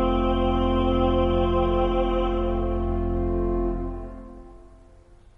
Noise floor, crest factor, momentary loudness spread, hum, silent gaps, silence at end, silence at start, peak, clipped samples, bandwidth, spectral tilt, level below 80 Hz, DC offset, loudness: -50 dBFS; 14 dB; 12 LU; none; none; 0.2 s; 0 s; -8 dBFS; under 0.1%; 3.9 kHz; -9 dB/octave; -30 dBFS; under 0.1%; -24 LUFS